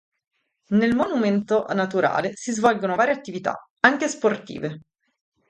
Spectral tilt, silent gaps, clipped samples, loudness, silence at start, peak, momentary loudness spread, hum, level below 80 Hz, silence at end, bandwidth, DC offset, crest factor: -5 dB/octave; 3.70-3.77 s; under 0.1%; -22 LUFS; 0.7 s; 0 dBFS; 10 LU; none; -60 dBFS; 0.7 s; 9.6 kHz; under 0.1%; 22 dB